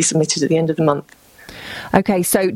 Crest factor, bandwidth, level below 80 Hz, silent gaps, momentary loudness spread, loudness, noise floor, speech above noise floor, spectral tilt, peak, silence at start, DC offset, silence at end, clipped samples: 18 dB; 16 kHz; -48 dBFS; none; 15 LU; -17 LUFS; -37 dBFS; 21 dB; -4.5 dB/octave; 0 dBFS; 0 s; under 0.1%; 0 s; under 0.1%